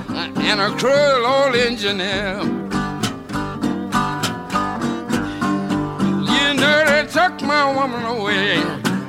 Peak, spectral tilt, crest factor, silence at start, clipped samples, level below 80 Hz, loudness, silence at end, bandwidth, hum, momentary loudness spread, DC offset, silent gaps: -2 dBFS; -4.5 dB/octave; 18 dB; 0 s; under 0.1%; -46 dBFS; -18 LUFS; 0 s; 16.5 kHz; none; 9 LU; under 0.1%; none